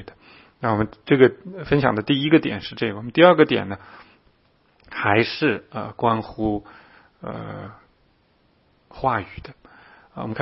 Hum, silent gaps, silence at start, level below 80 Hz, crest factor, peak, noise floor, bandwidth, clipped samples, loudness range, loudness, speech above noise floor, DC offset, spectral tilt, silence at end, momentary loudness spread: none; none; 0 s; -50 dBFS; 22 dB; 0 dBFS; -62 dBFS; 5.8 kHz; under 0.1%; 13 LU; -20 LUFS; 41 dB; under 0.1%; -9.5 dB/octave; 0 s; 20 LU